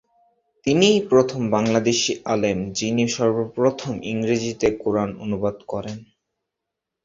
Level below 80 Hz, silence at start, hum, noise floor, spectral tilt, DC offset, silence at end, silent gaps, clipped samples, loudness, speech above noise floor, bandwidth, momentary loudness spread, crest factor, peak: -54 dBFS; 0.65 s; none; -83 dBFS; -4.5 dB/octave; under 0.1%; 1 s; none; under 0.1%; -21 LUFS; 62 dB; 7.8 kHz; 12 LU; 20 dB; -2 dBFS